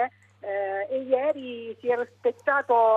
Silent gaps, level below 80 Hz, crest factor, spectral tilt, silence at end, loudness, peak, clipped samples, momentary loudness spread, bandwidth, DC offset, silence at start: none; -80 dBFS; 16 dB; -5.5 dB/octave; 0 s; -27 LUFS; -10 dBFS; under 0.1%; 10 LU; 7.4 kHz; under 0.1%; 0 s